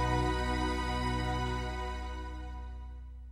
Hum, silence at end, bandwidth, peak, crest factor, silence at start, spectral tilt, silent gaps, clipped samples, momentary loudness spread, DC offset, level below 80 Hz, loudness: none; 0 s; 12.5 kHz; -20 dBFS; 14 dB; 0 s; -5.5 dB/octave; none; under 0.1%; 14 LU; under 0.1%; -38 dBFS; -35 LUFS